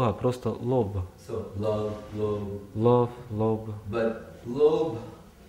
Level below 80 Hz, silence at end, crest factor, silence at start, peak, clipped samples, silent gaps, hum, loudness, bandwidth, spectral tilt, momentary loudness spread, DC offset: -54 dBFS; 0.05 s; 18 dB; 0 s; -10 dBFS; under 0.1%; none; none; -28 LUFS; 13.5 kHz; -8.5 dB/octave; 13 LU; under 0.1%